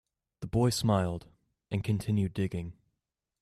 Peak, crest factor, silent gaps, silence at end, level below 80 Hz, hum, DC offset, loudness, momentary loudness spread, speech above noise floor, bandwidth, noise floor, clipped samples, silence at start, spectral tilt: -16 dBFS; 16 dB; none; 0.7 s; -54 dBFS; none; under 0.1%; -31 LUFS; 14 LU; 57 dB; 14 kHz; -86 dBFS; under 0.1%; 0.4 s; -6.5 dB/octave